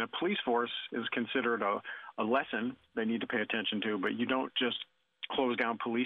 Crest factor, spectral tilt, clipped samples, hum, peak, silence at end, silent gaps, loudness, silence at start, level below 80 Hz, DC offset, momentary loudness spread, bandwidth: 18 dB; -7 dB/octave; under 0.1%; none; -16 dBFS; 0 s; none; -33 LUFS; 0 s; -76 dBFS; under 0.1%; 6 LU; 4.7 kHz